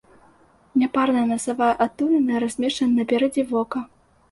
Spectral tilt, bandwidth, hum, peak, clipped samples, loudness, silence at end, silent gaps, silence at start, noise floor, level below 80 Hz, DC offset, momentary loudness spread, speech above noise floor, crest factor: -4.5 dB/octave; 11.5 kHz; none; -6 dBFS; under 0.1%; -22 LUFS; 0.45 s; none; 0.75 s; -55 dBFS; -60 dBFS; under 0.1%; 5 LU; 34 dB; 16 dB